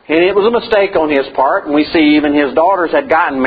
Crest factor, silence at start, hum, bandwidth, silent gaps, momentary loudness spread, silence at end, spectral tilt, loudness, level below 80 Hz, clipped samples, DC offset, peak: 12 dB; 0.1 s; none; 5 kHz; none; 4 LU; 0 s; -7.5 dB/octave; -12 LUFS; -44 dBFS; under 0.1%; under 0.1%; 0 dBFS